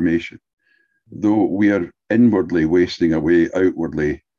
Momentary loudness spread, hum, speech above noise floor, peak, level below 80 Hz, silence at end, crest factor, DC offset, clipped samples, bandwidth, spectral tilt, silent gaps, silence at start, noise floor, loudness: 7 LU; none; 45 dB; -4 dBFS; -44 dBFS; 0.2 s; 14 dB; under 0.1%; under 0.1%; 7.2 kHz; -7.5 dB/octave; 0.53-0.57 s; 0 s; -62 dBFS; -18 LUFS